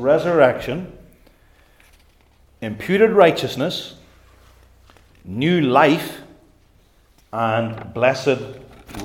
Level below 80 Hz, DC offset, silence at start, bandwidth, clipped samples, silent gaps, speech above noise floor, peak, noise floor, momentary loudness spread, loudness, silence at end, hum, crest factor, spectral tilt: -52 dBFS; under 0.1%; 0 s; 17 kHz; under 0.1%; none; 37 dB; 0 dBFS; -55 dBFS; 20 LU; -18 LUFS; 0 s; none; 20 dB; -6 dB/octave